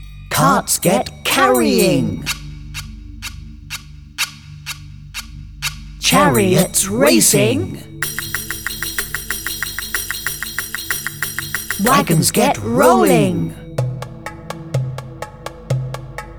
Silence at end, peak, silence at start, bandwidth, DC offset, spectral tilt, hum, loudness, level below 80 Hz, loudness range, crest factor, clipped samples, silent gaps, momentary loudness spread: 0 s; 0 dBFS; 0 s; 19.5 kHz; under 0.1%; -4 dB/octave; 50 Hz at -50 dBFS; -16 LUFS; -38 dBFS; 9 LU; 18 dB; under 0.1%; none; 18 LU